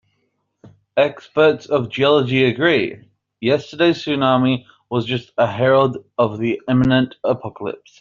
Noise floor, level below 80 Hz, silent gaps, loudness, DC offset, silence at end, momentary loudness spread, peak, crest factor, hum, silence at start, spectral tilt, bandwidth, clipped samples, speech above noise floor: -69 dBFS; -54 dBFS; none; -18 LUFS; under 0.1%; 0.25 s; 9 LU; -2 dBFS; 16 dB; none; 0.65 s; -4.5 dB/octave; 7.4 kHz; under 0.1%; 52 dB